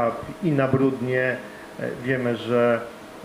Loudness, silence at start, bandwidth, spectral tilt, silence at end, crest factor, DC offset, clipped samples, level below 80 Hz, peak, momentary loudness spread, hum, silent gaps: -24 LUFS; 0 s; 15.5 kHz; -7.5 dB/octave; 0 s; 18 dB; under 0.1%; under 0.1%; -58 dBFS; -6 dBFS; 12 LU; none; none